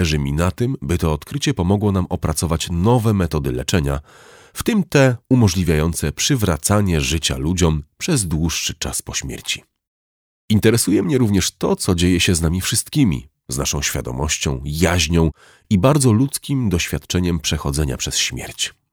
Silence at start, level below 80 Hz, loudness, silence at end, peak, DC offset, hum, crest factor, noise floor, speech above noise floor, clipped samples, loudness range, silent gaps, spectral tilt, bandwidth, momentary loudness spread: 0 s; -32 dBFS; -19 LUFS; 0.25 s; -2 dBFS; under 0.1%; none; 18 dB; under -90 dBFS; over 72 dB; under 0.1%; 3 LU; 9.87-10.48 s; -4.5 dB/octave; over 20 kHz; 8 LU